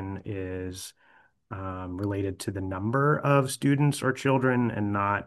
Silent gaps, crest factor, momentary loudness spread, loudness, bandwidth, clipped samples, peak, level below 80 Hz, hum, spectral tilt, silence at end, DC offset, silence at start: none; 20 dB; 13 LU; -27 LUFS; 12.5 kHz; under 0.1%; -8 dBFS; -64 dBFS; none; -6.5 dB/octave; 0 s; under 0.1%; 0 s